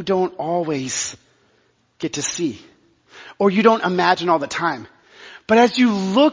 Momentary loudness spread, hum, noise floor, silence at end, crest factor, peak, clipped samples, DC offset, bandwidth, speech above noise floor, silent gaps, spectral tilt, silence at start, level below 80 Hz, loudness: 12 LU; none; -61 dBFS; 0 s; 20 dB; 0 dBFS; under 0.1%; under 0.1%; 7.6 kHz; 43 dB; none; -4 dB/octave; 0 s; -60 dBFS; -19 LUFS